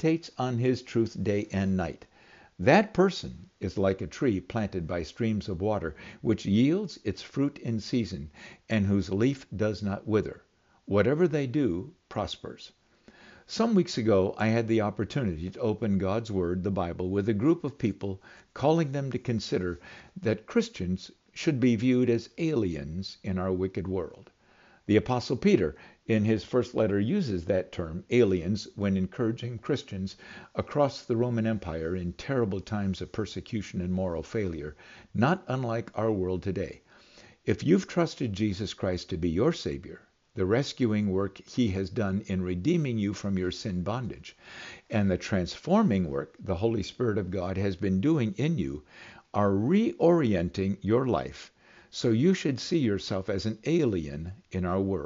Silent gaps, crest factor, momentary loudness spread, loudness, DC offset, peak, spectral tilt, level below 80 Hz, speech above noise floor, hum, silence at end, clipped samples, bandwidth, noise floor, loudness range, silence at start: none; 20 dB; 12 LU; -29 LUFS; under 0.1%; -8 dBFS; -6.5 dB/octave; -56 dBFS; 32 dB; none; 0 s; under 0.1%; 7.6 kHz; -60 dBFS; 3 LU; 0 s